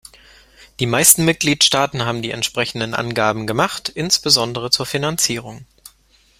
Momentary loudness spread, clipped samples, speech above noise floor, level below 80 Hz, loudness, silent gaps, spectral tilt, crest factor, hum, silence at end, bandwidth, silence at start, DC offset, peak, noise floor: 10 LU; under 0.1%; 37 dB; -50 dBFS; -16 LUFS; none; -2.5 dB/octave; 20 dB; none; 0.75 s; 16.5 kHz; 0.6 s; under 0.1%; 0 dBFS; -55 dBFS